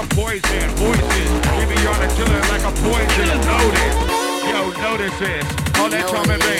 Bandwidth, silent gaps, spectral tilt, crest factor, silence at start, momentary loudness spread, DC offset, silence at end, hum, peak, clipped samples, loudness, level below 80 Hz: 16.5 kHz; none; -4 dB/octave; 14 dB; 0 s; 5 LU; under 0.1%; 0 s; none; -2 dBFS; under 0.1%; -17 LUFS; -22 dBFS